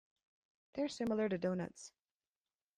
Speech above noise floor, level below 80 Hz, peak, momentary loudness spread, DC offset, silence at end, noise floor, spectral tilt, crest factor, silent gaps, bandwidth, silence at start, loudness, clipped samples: over 52 dB; -74 dBFS; -26 dBFS; 17 LU; under 0.1%; 0.9 s; under -90 dBFS; -6 dB/octave; 16 dB; none; 11 kHz; 0.75 s; -39 LUFS; under 0.1%